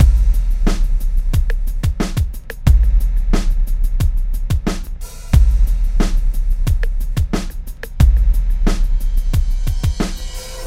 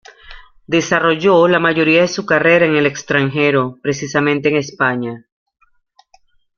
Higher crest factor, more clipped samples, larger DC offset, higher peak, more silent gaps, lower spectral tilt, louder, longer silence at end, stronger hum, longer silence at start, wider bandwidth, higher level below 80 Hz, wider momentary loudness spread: about the same, 14 dB vs 14 dB; neither; neither; about the same, 0 dBFS vs 0 dBFS; neither; about the same, -6 dB/octave vs -5 dB/octave; second, -19 LUFS vs -14 LUFS; second, 0 s vs 1.4 s; neither; second, 0 s vs 0.25 s; first, 15 kHz vs 7.2 kHz; first, -14 dBFS vs -52 dBFS; about the same, 9 LU vs 8 LU